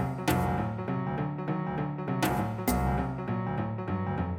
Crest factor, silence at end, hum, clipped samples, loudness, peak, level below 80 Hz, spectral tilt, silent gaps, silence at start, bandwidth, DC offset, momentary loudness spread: 16 dB; 0 s; none; under 0.1%; -31 LUFS; -14 dBFS; -42 dBFS; -6.5 dB/octave; none; 0 s; 18.5 kHz; under 0.1%; 4 LU